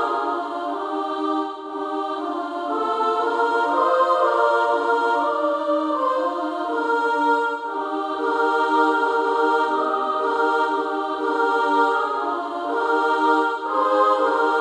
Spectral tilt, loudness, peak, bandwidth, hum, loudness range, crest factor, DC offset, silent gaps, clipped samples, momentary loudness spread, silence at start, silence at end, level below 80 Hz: -3 dB/octave; -21 LUFS; -6 dBFS; 10.5 kHz; none; 2 LU; 16 dB; under 0.1%; none; under 0.1%; 8 LU; 0 s; 0 s; -70 dBFS